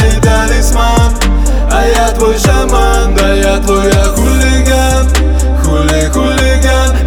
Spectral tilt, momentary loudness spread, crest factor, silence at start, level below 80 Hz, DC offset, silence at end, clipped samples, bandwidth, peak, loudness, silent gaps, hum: -5 dB/octave; 2 LU; 8 dB; 0 s; -10 dBFS; under 0.1%; 0 s; under 0.1%; 17 kHz; 0 dBFS; -10 LUFS; none; none